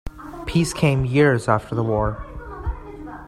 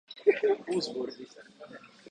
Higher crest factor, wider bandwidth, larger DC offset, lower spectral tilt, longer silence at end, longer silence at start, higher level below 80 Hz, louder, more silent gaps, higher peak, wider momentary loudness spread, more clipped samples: about the same, 20 dB vs 22 dB; first, 13.5 kHz vs 9.6 kHz; neither; first, -6.5 dB/octave vs -4.5 dB/octave; second, 0 s vs 0.25 s; about the same, 0.05 s vs 0.1 s; first, -36 dBFS vs -80 dBFS; first, -21 LUFS vs -30 LUFS; neither; first, -2 dBFS vs -10 dBFS; second, 18 LU vs 23 LU; neither